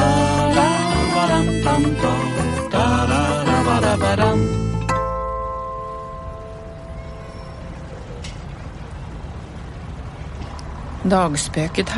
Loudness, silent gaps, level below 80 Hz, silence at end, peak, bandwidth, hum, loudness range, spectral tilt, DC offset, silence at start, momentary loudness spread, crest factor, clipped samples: -19 LUFS; none; -32 dBFS; 0 s; -2 dBFS; 11.5 kHz; none; 16 LU; -5.5 dB/octave; under 0.1%; 0 s; 17 LU; 18 dB; under 0.1%